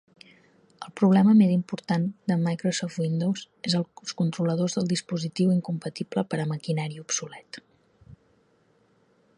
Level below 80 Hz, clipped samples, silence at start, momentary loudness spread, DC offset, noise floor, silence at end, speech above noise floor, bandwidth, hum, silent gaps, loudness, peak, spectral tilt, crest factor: -68 dBFS; under 0.1%; 0.8 s; 13 LU; under 0.1%; -64 dBFS; 1.25 s; 39 dB; 10.5 kHz; none; none; -26 LUFS; -10 dBFS; -6 dB/octave; 18 dB